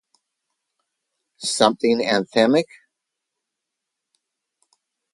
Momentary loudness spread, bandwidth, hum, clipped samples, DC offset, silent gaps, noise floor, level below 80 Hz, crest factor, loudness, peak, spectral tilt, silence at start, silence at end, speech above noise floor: 10 LU; 11.5 kHz; none; under 0.1%; under 0.1%; none; -82 dBFS; -70 dBFS; 24 dB; -19 LUFS; 0 dBFS; -3.5 dB/octave; 1.4 s; 2.5 s; 63 dB